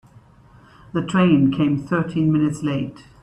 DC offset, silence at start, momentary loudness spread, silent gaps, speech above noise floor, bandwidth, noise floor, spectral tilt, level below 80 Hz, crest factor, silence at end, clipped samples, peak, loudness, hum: under 0.1%; 0.95 s; 11 LU; none; 30 dB; 11 kHz; -49 dBFS; -7.5 dB/octave; -52 dBFS; 16 dB; 0.2 s; under 0.1%; -4 dBFS; -20 LUFS; none